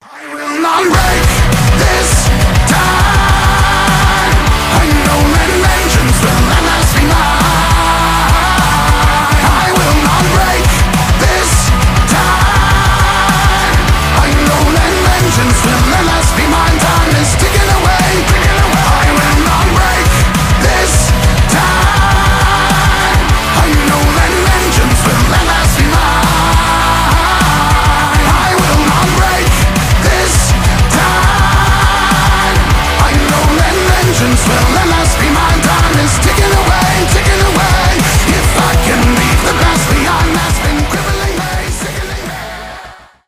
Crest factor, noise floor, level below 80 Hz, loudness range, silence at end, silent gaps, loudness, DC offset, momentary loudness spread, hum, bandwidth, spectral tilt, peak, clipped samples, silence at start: 8 dB; -33 dBFS; -14 dBFS; 0 LU; 0.3 s; none; -9 LUFS; under 0.1%; 1 LU; none; 16.5 kHz; -4 dB/octave; 0 dBFS; under 0.1%; 0.15 s